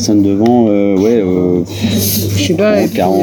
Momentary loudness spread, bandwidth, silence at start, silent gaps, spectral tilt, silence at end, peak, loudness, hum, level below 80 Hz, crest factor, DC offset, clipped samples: 4 LU; 20 kHz; 0 s; none; -5.5 dB/octave; 0 s; -2 dBFS; -12 LUFS; none; -44 dBFS; 10 dB; under 0.1%; under 0.1%